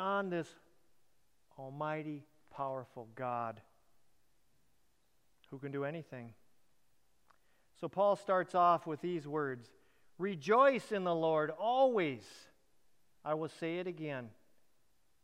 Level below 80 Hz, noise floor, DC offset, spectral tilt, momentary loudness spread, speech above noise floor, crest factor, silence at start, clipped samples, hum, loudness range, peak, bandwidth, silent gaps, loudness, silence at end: -84 dBFS; -78 dBFS; under 0.1%; -6.5 dB/octave; 20 LU; 43 dB; 20 dB; 0 s; under 0.1%; none; 15 LU; -16 dBFS; 12 kHz; none; -35 LUFS; 0.95 s